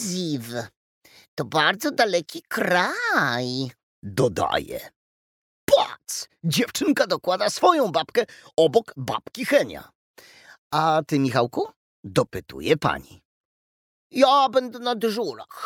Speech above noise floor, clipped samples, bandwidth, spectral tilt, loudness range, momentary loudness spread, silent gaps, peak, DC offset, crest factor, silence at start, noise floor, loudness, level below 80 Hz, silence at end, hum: over 67 dB; under 0.1%; 18 kHz; -4.5 dB/octave; 3 LU; 13 LU; 0.76-1.01 s, 1.28-1.37 s, 3.83-4.02 s, 4.96-5.68 s, 9.95-10.14 s, 10.58-10.70 s, 11.76-12.03 s, 13.25-14.10 s; -4 dBFS; under 0.1%; 20 dB; 0 s; under -90 dBFS; -23 LUFS; -58 dBFS; 0 s; none